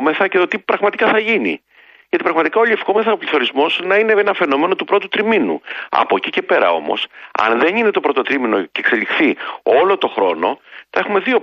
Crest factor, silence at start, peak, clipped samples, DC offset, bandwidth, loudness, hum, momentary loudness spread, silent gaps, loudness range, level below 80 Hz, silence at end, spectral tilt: 14 dB; 0 s; 0 dBFS; under 0.1%; under 0.1%; 6.8 kHz; -16 LUFS; none; 7 LU; none; 1 LU; -66 dBFS; 0 s; -5.5 dB/octave